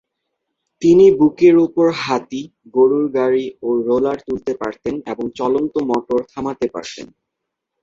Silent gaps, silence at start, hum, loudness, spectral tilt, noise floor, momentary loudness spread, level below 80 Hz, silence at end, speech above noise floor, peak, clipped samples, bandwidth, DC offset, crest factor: none; 0.8 s; none; -17 LUFS; -6.5 dB/octave; -79 dBFS; 14 LU; -56 dBFS; 0.75 s; 63 dB; -2 dBFS; under 0.1%; 7.6 kHz; under 0.1%; 16 dB